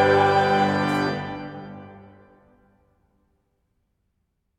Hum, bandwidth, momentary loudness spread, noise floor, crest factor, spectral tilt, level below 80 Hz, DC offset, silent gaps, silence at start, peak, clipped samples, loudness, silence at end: none; 13.5 kHz; 22 LU; -74 dBFS; 18 dB; -6 dB/octave; -60 dBFS; under 0.1%; none; 0 s; -6 dBFS; under 0.1%; -21 LUFS; 2.6 s